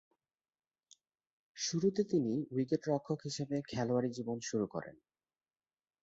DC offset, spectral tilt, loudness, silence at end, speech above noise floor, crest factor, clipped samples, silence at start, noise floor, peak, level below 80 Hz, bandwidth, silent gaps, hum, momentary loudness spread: under 0.1%; -6.5 dB/octave; -36 LUFS; 1.1 s; over 55 dB; 18 dB; under 0.1%; 1.55 s; under -90 dBFS; -20 dBFS; -74 dBFS; 8 kHz; none; none; 7 LU